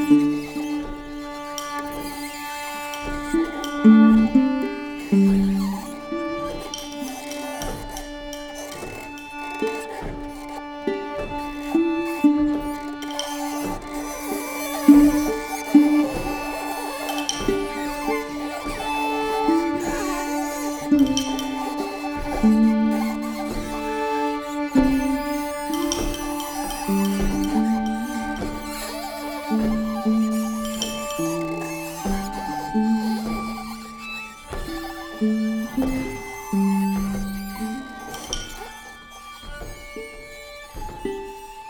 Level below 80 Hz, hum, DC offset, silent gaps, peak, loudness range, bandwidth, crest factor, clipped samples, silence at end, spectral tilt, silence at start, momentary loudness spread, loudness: -40 dBFS; none; under 0.1%; none; 0 dBFS; 11 LU; 19 kHz; 22 dB; under 0.1%; 0 s; -5 dB/octave; 0 s; 15 LU; -23 LUFS